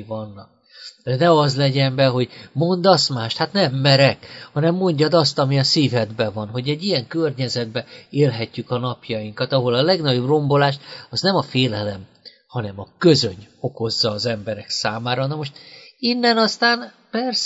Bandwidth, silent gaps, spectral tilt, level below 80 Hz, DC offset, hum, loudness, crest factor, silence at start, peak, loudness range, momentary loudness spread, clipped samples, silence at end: 8 kHz; none; -5.5 dB/octave; -60 dBFS; under 0.1%; none; -19 LUFS; 18 dB; 0 s; 0 dBFS; 4 LU; 14 LU; under 0.1%; 0 s